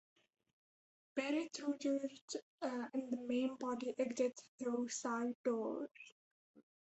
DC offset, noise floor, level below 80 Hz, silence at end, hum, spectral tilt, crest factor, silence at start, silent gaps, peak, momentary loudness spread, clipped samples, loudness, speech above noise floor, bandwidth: under 0.1%; under -90 dBFS; -88 dBFS; 0.25 s; none; -3.5 dB/octave; 18 dB; 1.15 s; 2.21-2.28 s, 2.42-2.58 s, 4.48-4.58 s, 5.35-5.44 s, 6.12-6.54 s; -24 dBFS; 8 LU; under 0.1%; -41 LUFS; over 49 dB; 8.2 kHz